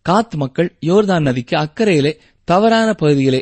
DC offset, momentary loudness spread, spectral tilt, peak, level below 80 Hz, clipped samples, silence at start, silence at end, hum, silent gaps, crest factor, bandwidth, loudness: under 0.1%; 6 LU; -6.5 dB/octave; -2 dBFS; -48 dBFS; under 0.1%; 0.05 s; 0 s; none; none; 12 dB; 8.8 kHz; -15 LUFS